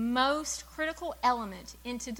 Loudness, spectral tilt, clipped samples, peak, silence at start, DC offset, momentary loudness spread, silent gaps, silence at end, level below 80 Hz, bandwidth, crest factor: -32 LUFS; -2.5 dB/octave; under 0.1%; -12 dBFS; 0 s; under 0.1%; 13 LU; none; 0 s; -54 dBFS; 17.5 kHz; 20 dB